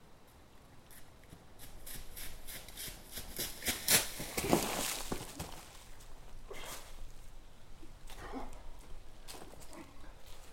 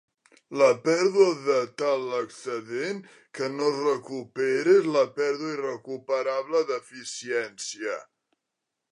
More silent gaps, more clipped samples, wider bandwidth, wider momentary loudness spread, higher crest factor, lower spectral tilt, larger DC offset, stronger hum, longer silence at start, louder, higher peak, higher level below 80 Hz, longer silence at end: neither; neither; first, 16.5 kHz vs 11 kHz; first, 24 LU vs 14 LU; first, 30 dB vs 20 dB; second, -2 dB/octave vs -4 dB/octave; neither; neither; second, 0 s vs 0.5 s; second, -37 LUFS vs -26 LUFS; second, -10 dBFS vs -6 dBFS; first, -50 dBFS vs -82 dBFS; second, 0 s vs 0.9 s